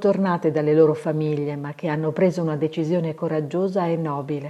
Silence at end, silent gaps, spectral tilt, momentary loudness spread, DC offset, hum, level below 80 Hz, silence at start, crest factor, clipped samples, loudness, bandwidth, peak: 0 s; none; -8.5 dB/octave; 8 LU; under 0.1%; none; -68 dBFS; 0 s; 16 dB; under 0.1%; -22 LUFS; 11 kHz; -6 dBFS